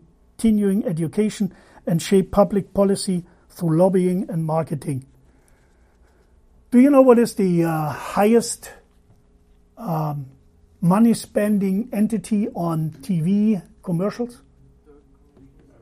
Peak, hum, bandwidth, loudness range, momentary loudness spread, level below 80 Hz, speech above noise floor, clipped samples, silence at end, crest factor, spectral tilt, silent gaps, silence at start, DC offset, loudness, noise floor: 0 dBFS; none; 15.5 kHz; 5 LU; 12 LU; -50 dBFS; 36 dB; under 0.1%; 1.5 s; 20 dB; -7 dB/octave; none; 0.4 s; under 0.1%; -20 LUFS; -55 dBFS